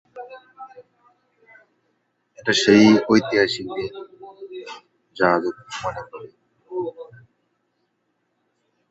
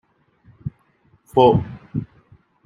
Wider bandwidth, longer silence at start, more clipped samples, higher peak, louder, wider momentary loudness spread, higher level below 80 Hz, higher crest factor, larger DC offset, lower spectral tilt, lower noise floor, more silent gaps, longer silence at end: second, 8 kHz vs 12.5 kHz; second, 0.15 s vs 0.65 s; neither; about the same, -2 dBFS vs -2 dBFS; about the same, -19 LUFS vs -19 LUFS; first, 28 LU vs 20 LU; second, -60 dBFS vs -48 dBFS; about the same, 22 dB vs 20 dB; neither; second, -4.5 dB/octave vs -9 dB/octave; first, -72 dBFS vs -59 dBFS; neither; first, 1.9 s vs 0.6 s